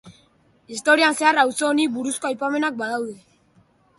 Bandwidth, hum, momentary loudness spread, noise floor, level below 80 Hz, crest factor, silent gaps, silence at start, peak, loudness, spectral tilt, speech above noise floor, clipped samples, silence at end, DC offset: 12 kHz; none; 11 LU; -59 dBFS; -70 dBFS; 18 dB; none; 0.05 s; -4 dBFS; -20 LUFS; -2 dB/octave; 38 dB; under 0.1%; 0.8 s; under 0.1%